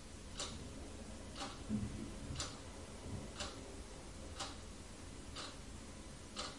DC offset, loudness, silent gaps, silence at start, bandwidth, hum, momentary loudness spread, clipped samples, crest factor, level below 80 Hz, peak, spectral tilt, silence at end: under 0.1%; -48 LUFS; none; 0 s; 11.5 kHz; none; 9 LU; under 0.1%; 20 dB; -56 dBFS; -30 dBFS; -4 dB/octave; 0 s